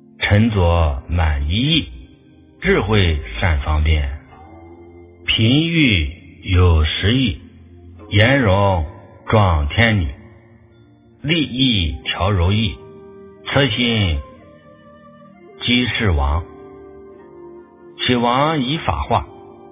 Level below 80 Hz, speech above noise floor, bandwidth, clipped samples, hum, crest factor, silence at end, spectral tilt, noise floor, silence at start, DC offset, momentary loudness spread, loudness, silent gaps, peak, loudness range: -26 dBFS; 32 dB; 3.9 kHz; under 0.1%; none; 18 dB; 0.2 s; -10 dB/octave; -48 dBFS; 0.2 s; under 0.1%; 13 LU; -17 LUFS; none; 0 dBFS; 4 LU